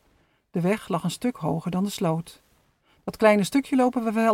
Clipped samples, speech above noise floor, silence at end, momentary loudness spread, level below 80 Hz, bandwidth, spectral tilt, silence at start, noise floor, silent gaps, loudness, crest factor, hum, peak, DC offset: under 0.1%; 41 dB; 0 s; 13 LU; -60 dBFS; 17 kHz; -6 dB/octave; 0.55 s; -64 dBFS; none; -24 LUFS; 20 dB; none; -6 dBFS; under 0.1%